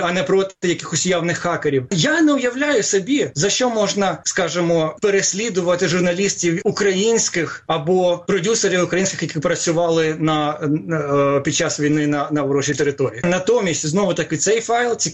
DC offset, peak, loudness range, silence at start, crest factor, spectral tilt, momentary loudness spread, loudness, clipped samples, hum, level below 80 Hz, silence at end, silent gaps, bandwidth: under 0.1%; -6 dBFS; 1 LU; 0 s; 12 dB; -4 dB/octave; 3 LU; -18 LUFS; under 0.1%; none; -56 dBFS; 0 s; none; 11.5 kHz